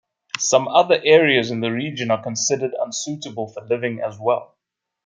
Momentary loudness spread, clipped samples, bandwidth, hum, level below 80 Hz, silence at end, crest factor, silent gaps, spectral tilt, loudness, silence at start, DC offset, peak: 14 LU; under 0.1%; 9.6 kHz; none; -68 dBFS; 0.6 s; 20 dB; none; -3 dB/octave; -19 LUFS; 0.35 s; under 0.1%; 0 dBFS